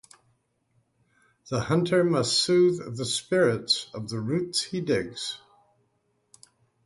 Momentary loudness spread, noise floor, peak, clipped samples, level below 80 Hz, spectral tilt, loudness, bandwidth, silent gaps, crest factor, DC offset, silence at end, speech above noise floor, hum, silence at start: 11 LU; -72 dBFS; -10 dBFS; under 0.1%; -62 dBFS; -4.5 dB/octave; -25 LUFS; 11.5 kHz; none; 18 dB; under 0.1%; 1.5 s; 47 dB; none; 1.45 s